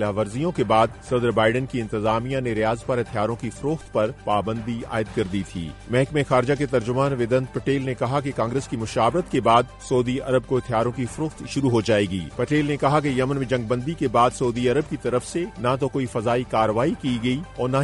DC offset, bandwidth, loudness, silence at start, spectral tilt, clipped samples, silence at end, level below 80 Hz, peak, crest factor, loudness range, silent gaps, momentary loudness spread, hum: under 0.1%; 11.5 kHz; -23 LUFS; 0 s; -6.5 dB/octave; under 0.1%; 0 s; -46 dBFS; -6 dBFS; 18 dB; 3 LU; none; 7 LU; none